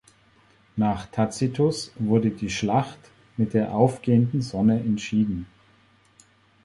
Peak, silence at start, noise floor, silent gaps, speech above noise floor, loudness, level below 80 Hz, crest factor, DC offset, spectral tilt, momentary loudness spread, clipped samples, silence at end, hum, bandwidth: -4 dBFS; 0.75 s; -59 dBFS; none; 36 dB; -24 LUFS; -52 dBFS; 20 dB; under 0.1%; -7 dB/octave; 8 LU; under 0.1%; 1.2 s; none; 11.5 kHz